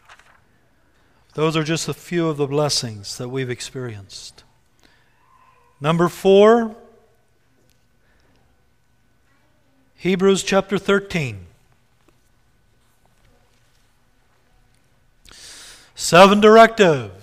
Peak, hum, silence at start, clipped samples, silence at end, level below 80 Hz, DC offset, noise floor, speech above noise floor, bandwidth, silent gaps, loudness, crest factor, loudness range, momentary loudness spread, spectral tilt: 0 dBFS; none; 1.35 s; under 0.1%; 0.1 s; -54 dBFS; under 0.1%; -62 dBFS; 46 dB; 15.5 kHz; none; -17 LUFS; 20 dB; 11 LU; 26 LU; -5 dB/octave